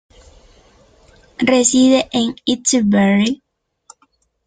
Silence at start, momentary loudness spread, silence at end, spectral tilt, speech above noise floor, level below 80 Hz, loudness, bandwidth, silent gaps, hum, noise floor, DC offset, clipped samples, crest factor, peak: 1.4 s; 8 LU; 1.1 s; -4 dB/octave; 47 dB; -52 dBFS; -15 LUFS; 9.6 kHz; none; none; -61 dBFS; under 0.1%; under 0.1%; 16 dB; 0 dBFS